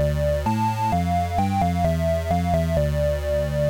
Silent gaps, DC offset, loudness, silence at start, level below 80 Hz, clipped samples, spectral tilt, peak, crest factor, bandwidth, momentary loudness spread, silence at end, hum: none; under 0.1%; -22 LUFS; 0 s; -30 dBFS; under 0.1%; -7.5 dB/octave; -8 dBFS; 12 dB; 17 kHz; 2 LU; 0 s; none